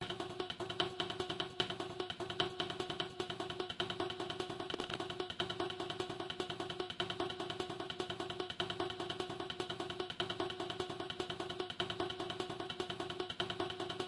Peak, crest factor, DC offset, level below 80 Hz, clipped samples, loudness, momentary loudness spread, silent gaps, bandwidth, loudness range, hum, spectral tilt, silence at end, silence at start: -18 dBFS; 24 dB; under 0.1%; -68 dBFS; under 0.1%; -41 LUFS; 4 LU; none; 11.5 kHz; 1 LU; none; -4 dB/octave; 0 s; 0 s